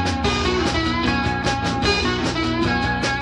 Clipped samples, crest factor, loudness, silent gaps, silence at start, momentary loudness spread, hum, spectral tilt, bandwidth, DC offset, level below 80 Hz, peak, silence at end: under 0.1%; 16 dB; -20 LUFS; none; 0 s; 2 LU; 60 Hz at -35 dBFS; -4.5 dB/octave; 11.5 kHz; under 0.1%; -32 dBFS; -6 dBFS; 0 s